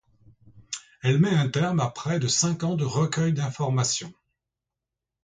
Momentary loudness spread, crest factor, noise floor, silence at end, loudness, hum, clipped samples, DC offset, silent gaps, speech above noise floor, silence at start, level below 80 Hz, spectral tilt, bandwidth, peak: 11 LU; 16 dB; -87 dBFS; 1.15 s; -25 LUFS; none; under 0.1%; under 0.1%; none; 63 dB; 0.55 s; -60 dBFS; -5 dB/octave; 9.6 kHz; -10 dBFS